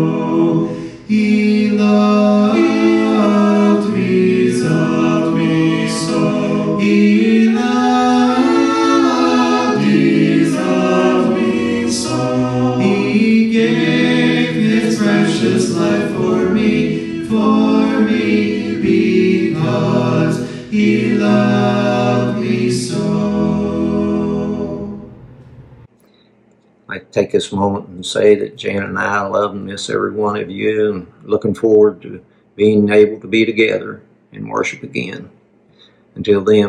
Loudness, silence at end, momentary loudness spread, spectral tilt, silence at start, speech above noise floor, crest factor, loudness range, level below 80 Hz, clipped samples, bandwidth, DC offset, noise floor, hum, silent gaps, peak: -14 LUFS; 0 s; 9 LU; -6 dB/octave; 0 s; 38 dB; 14 dB; 6 LU; -48 dBFS; under 0.1%; 11.5 kHz; under 0.1%; -52 dBFS; none; none; 0 dBFS